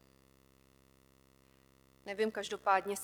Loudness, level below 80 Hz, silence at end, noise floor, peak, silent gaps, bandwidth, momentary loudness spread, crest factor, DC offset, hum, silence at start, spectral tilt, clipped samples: -35 LUFS; -74 dBFS; 0 s; -66 dBFS; -16 dBFS; none; 19.5 kHz; 14 LU; 24 dB; under 0.1%; 50 Hz at -70 dBFS; 2.05 s; -3 dB/octave; under 0.1%